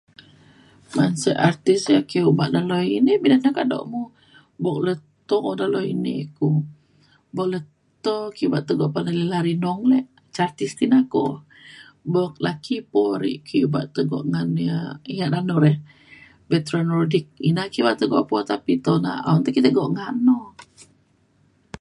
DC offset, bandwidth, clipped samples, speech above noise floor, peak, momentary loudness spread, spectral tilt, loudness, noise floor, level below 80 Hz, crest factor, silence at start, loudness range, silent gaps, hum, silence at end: under 0.1%; 11.5 kHz; under 0.1%; 40 dB; -2 dBFS; 9 LU; -7 dB/octave; -21 LUFS; -61 dBFS; -62 dBFS; 20 dB; 0.9 s; 5 LU; none; none; 0.05 s